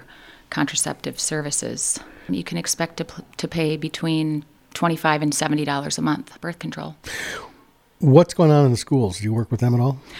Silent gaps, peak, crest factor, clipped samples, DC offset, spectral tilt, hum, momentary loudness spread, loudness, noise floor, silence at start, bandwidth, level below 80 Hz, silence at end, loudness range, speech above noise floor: none; 0 dBFS; 22 dB; under 0.1%; under 0.1%; -5 dB/octave; none; 16 LU; -21 LUFS; -53 dBFS; 0 s; 16.5 kHz; -54 dBFS; 0 s; 5 LU; 33 dB